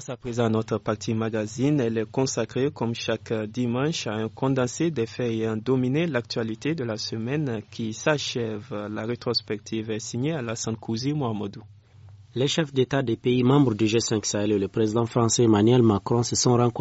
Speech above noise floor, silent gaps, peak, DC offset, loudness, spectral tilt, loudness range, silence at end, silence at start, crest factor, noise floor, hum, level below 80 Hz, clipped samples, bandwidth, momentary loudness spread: 24 dB; none; -8 dBFS; under 0.1%; -25 LUFS; -5.5 dB/octave; 7 LU; 0 s; 0 s; 16 dB; -49 dBFS; none; -60 dBFS; under 0.1%; 8 kHz; 10 LU